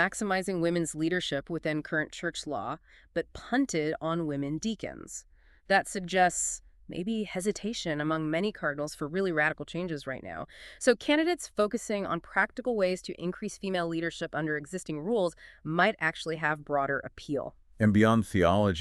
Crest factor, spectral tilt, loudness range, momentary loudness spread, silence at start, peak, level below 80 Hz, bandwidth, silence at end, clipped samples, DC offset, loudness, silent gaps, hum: 20 dB; -4.5 dB/octave; 3 LU; 11 LU; 0 s; -10 dBFS; -56 dBFS; 13 kHz; 0 s; under 0.1%; under 0.1%; -30 LUFS; none; none